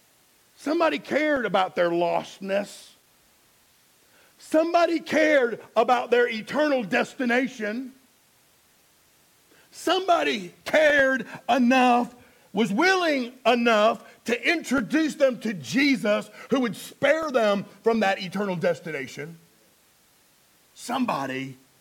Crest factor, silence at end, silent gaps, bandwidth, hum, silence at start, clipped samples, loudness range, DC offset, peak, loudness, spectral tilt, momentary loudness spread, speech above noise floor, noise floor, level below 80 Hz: 18 dB; 0.25 s; none; 17 kHz; none; 0.6 s; under 0.1%; 7 LU; under 0.1%; -8 dBFS; -24 LUFS; -4.5 dB/octave; 11 LU; 37 dB; -61 dBFS; -68 dBFS